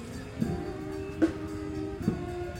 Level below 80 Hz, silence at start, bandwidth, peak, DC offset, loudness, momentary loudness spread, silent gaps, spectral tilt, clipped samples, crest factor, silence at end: -46 dBFS; 0 s; 16 kHz; -14 dBFS; under 0.1%; -33 LUFS; 7 LU; none; -7.5 dB/octave; under 0.1%; 20 dB; 0 s